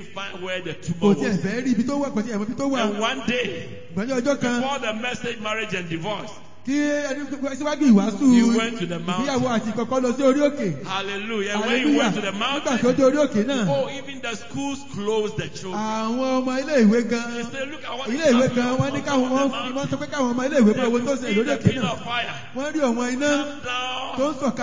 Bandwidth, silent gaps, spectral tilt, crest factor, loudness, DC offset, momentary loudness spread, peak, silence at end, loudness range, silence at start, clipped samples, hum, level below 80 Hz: 7.6 kHz; none; -5 dB/octave; 18 dB; -23 LUFS; 1%; 11 LU; -4 dBFS; 0 s; 4 LU; 0 s; under 0.1%; none; -56 dBFS